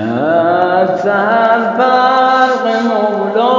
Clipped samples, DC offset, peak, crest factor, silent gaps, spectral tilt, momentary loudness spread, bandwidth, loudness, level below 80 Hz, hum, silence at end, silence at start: under 0.1%; under 0.1%; 0 dBFS; 12 dB; none; -6 dB/octave; 4 LU; 7.6 kHz; -12 LUFS; -62 dBFS; none; 0 s; 0 s